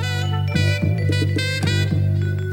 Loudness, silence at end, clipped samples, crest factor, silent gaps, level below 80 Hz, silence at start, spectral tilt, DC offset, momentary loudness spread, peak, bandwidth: -20 LUFS; 0 s; under 0.1%; 12 dB; none; -46 dBFS; 0 s; -6 dB/octave; under 0.1%; 2 LU; -8 dBFS; 13 kHz